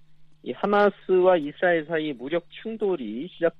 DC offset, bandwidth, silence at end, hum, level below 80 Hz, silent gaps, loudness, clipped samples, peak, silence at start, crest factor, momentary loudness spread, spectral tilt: under 0.1%; 5.4 kHz; 0.1 s; none; -64 dBFS; none; -24 LUFS; under 0.1%; -8 dBFS; 0.1 s; 18 dB; 14 LU; -8 dB/octave